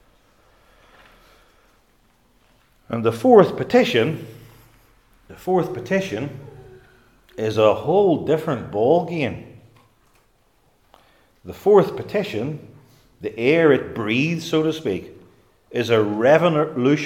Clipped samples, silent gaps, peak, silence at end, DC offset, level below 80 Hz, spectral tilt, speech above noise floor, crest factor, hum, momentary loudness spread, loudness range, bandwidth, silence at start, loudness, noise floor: under 0.1%; none; 0 dBFS; 0 s; under 0.1%; -58 dBFS; -6.5 dB/octave; 42 dB; 22 dB; none; 17 LU; 6 LU; 15.5 kHz; 2.9 s; -19 LUFS; -61 dBFS